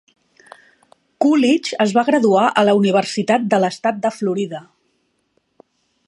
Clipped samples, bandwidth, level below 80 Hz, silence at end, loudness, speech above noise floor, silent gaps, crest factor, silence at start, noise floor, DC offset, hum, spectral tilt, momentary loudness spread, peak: under 0.1%; 11.5 kHz; -70 dBFS; 1.45 s; -17 LUFS; 50 dB; none; 18 dB; 1.2 s; -66 dBFS; under 0.1%; none; -5.5 dB/octave; 8 LU; 0 dBFS